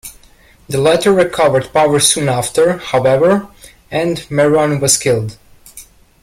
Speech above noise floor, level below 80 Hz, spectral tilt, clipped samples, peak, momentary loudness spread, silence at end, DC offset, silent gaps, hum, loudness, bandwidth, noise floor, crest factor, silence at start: 33 dB; -46 dBFS; -4 dB/octave; under 0.1%; 0 dBFS; 8 LU; 0.4 s; under 0.1%; none; none; -13 LUFS; 16.5 kHz; -46 dBFS; 14 dB; 0.05 s